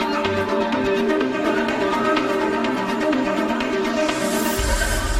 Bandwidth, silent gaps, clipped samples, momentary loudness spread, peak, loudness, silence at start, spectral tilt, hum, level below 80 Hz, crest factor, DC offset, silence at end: 16 kHz; none; under 0.1%; 2 LU; -6 dBFS; -21 LUFS; 0 s; -4 dB/octave; none; -32 dBFS; 14 dB; under 0.1%; 0 s